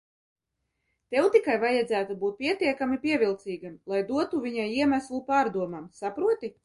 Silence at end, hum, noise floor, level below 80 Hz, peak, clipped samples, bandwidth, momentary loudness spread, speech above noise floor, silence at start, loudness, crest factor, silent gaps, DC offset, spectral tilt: 0.15 s; none; -80 dBFS; -66 dBFS; -10 dBFS; under 0.1%; 11.5 kHz; 11 LU; 54 dB; 1.1 s; -27 LUFS; 18 dB; none; under 0.1%; -5.5 dB/octave